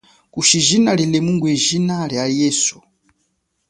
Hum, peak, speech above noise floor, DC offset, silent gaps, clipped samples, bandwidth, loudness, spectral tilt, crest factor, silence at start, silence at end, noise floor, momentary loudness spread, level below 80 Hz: none; -2 dBFS; 52 dB; under 0.1%; none; under 0.1%; 11.5 kHz; -16 LUFS; -3.5 dB/octave; 16 dB; 0.35 s; 0.95 s; -68 dBFS; 7 LU; -56 dBFS